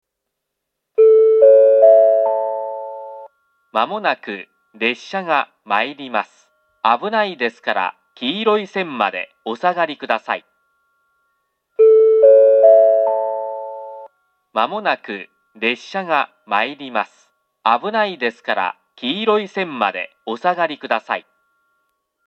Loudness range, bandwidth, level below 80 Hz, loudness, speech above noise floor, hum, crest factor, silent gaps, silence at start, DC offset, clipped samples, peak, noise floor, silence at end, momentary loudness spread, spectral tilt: 8 LU; 6.8 kHz; -84 dBFS; -17 LUFS; 58 dB; none; 16 dB; none; 1 s; under 0.1%; under 0.1%; 0 dBFS; -78 dBFS; 1.05 s; 17 LU; -5 dB/octave